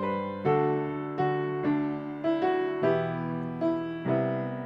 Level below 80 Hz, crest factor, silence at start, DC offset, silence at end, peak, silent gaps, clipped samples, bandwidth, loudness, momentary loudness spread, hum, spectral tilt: -64 dBFS; 16 dB; 0 s; under 0.1%; 0 s; -12 dBFS; none; under 0.1%; 5.8 kHz; -29 LUFS; 5 LU; none; -9.5 dB/octave